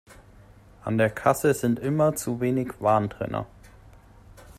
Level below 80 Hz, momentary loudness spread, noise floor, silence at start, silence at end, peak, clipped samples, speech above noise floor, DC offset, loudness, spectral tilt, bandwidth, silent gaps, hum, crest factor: -54 dBFS; 9 LU; -51 dBFS; 0.1 s; 0.05 s; -6 dBFS; under 0.1%; 27 dB; under 0.1%; -25 LUFS; -6.5 dB/octave; 16 kHz; none; none; 20 dB